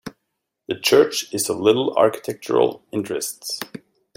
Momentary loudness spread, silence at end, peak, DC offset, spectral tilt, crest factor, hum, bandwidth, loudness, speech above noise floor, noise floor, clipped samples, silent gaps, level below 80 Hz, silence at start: 14 LU; 0.4 s; -2 dBFS; under 0.1%; -3.5 dB/octave; 20 dB; none; 16.5 kHz; -20 LUFS; 58 dB; -78 dBFS; under 0.1%; none; -64 dBFS; 0.05 s